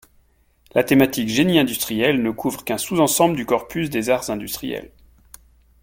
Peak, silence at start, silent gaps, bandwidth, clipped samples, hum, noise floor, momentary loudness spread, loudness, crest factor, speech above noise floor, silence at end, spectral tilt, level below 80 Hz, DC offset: -2 dBFS; 0.75 s; none; 17 kHz; under 0.1%; none; -58 dBFS; 10 LU; -20 LUFS; 20 dB; 39 dB; 0.95 s; -4.5 dB/octave; -52 dBFS; under 0.1%